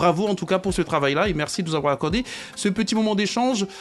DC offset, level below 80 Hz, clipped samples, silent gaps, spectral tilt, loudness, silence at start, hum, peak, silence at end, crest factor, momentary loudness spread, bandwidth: under 0.1%; -44 dBFS; under 0.1%; none; -5 dB/octave; -23 LUFS; 0 s; none; -6 dBFS; 0 s; 16 dB; 4 LU; 12.5 kHz